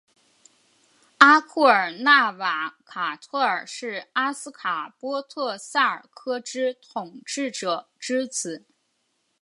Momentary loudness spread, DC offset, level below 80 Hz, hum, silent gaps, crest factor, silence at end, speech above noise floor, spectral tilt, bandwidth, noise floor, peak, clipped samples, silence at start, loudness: 15 LU; under 0.1%; -78 dBFS; none; none; 24 dB; 0.85 s; 48 dB; -2 dB/octave; 11.5 kHz; -72 dBFS; 0 dBFS; under 0.1%; 1.2 s; -23 LUFS